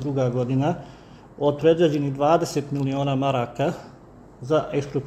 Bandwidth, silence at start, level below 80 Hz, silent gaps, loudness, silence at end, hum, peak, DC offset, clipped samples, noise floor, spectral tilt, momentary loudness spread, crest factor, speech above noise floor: 14 kHz; 0 s; -54 dBFS; none; -23 LUFS; 0 s; none; -6 dBFS; under 0.1%; under 0.1%; -47 dBFS; -7 dB/octave; 7 LU; 18 dB; 24 dB